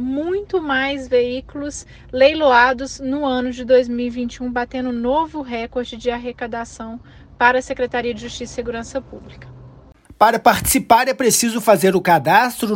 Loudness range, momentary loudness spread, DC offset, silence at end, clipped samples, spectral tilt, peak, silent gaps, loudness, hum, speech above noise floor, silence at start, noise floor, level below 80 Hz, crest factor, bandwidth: 7 LU; 15 LU; under 0.1%; 0 s; under 0.1%; -3.5 dB/octave; 0 dBFS; none; -18 LUFS; none; 26 dB; 0 s; -45 dBFS; -44 dBFS; 18 dB; 16.5 kHz